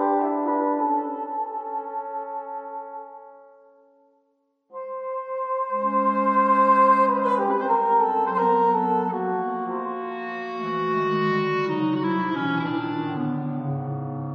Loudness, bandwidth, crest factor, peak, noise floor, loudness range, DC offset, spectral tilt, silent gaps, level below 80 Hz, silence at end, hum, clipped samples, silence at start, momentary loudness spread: -23 LUFS; 7.2 kHz; 16 dB; -8 dBFS; -69 dBFS; 14 LU; under 0.1%; -8.5 dB/octave; none; -74 dBFS; 0 s; none; under 0.1%; 0 s; 13 LU